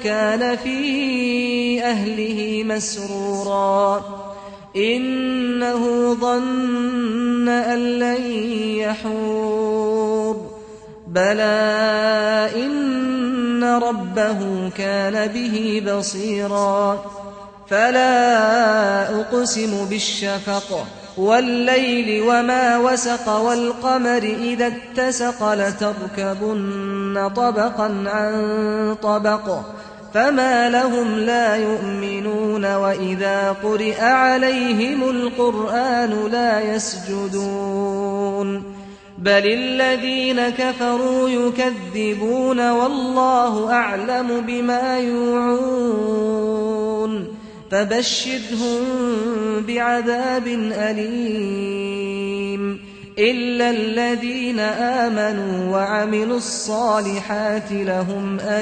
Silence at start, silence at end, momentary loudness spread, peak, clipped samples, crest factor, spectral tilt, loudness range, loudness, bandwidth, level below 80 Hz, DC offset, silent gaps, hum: 0 s; 0 s; 8 LU; -4 dBFS; under 0.1%; 16 dB; -4 dB/octave; 4 LU; -19 LUFS; 9.4 kHz; -56 dBFS; under 0.1%; none; none